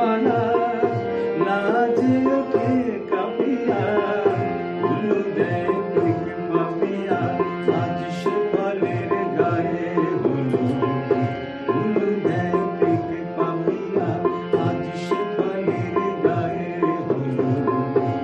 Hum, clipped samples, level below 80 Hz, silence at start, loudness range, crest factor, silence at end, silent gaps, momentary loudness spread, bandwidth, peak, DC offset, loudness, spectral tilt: none; under 0.1%; -58 dBFS; 0 s; 2 LU; 16 dB; 0 s; none; 4 LU; 8.4 kHz; -4 dBFS; under 0.1%; -22 LUFS; -8.5 dB/octave